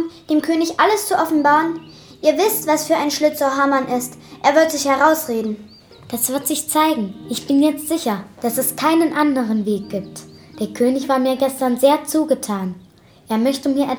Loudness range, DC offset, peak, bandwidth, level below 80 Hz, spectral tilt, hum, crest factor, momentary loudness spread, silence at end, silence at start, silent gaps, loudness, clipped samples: 3 LU; under 0.1%; 0 dBFS; over 20 kHz; -60 dBFS; -3.5 dB/octave; none; 18 dB; 12 LU; 0 s; 0 s; none; -18 LUFS; under 0.1%